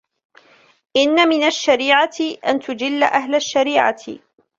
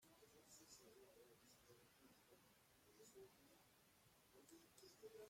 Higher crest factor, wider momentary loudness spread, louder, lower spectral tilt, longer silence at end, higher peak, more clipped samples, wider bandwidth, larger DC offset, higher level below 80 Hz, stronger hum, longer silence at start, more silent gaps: about the same, 16 dB vs 20 dB; first, 8 LU vs 4 LU; first, -17 LUFS vs -67 LUFS; about the same, -2 dB/octave vs -3 dB/octave; first, 0.4 s vs 0 s; first, -2 dBFS vs -50 dBFS; neither; second, 7.8 kHz vs 16.5 kHz; neither; first, -64 dBFS vs under -90 dBFS; neither; first, 0.95 s vs 0 s; neither